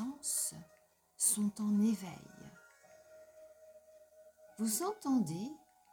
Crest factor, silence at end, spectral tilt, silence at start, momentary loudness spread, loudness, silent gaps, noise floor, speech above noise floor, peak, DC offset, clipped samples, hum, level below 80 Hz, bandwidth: 20 dB; 0.35 s; -4 dB/octave; 0 s; 24 LU; -35 LUFS; none; -69 dBFS; 34 dB; -18 dBFS; under 0.1%; under 0.1%; none; -78 dBFS; over 20 kHz